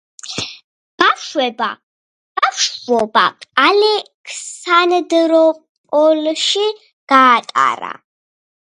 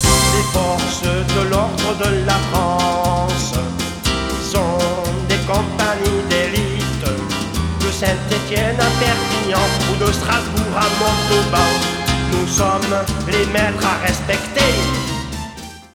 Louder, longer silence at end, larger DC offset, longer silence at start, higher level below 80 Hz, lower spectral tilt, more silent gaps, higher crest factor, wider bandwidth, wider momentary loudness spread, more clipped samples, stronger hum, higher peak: first, -14 LUFS vs -17 LUFS; first, 0.7 s vs 0.1 s; neither; first, 0.25 s vs 0 s; second, -64 dBFS vs -28 dBFS; second, -2 dB/octave vs -4 dB/octave; first, 0.64-0.98 s, 1.83-2.35 s, 4.14-4.24 s, 5.69-5.84 s, 6.93-7.07 s vs none; about the same, 16 dB vs 18 dB; second, 11 kHz vs 19.5 kHz; first, 16 LU vs 6 LU; neither; neither; about the same, 0 dBFS vs 0 dBFS